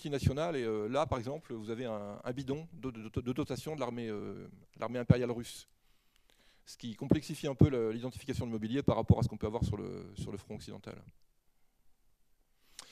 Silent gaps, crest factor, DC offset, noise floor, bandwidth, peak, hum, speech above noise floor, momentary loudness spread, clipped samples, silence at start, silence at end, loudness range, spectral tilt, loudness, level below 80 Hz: none; 26 dB; under 0.1%; -69 dBFS; 14.5 kHz; -8 dBFS; none; 35 dB; 17 LU; under 0.1%; 0 s; 0.05 s; 7 LU; -7.5 dB/octave; -35 LUFS; -54 dBFS